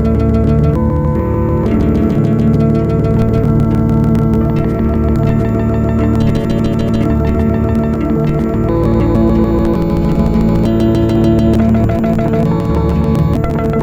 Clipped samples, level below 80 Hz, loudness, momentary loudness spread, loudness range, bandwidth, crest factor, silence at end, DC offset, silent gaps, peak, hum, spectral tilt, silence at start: under 0.1%; -20 dBFS; -13 LUFS; 3 LU; 1 LU; 15 kHz; 10 dB; 0 s; under 0.1%; none; 0 dBFS; none; -9.5 dB/octave; 0 s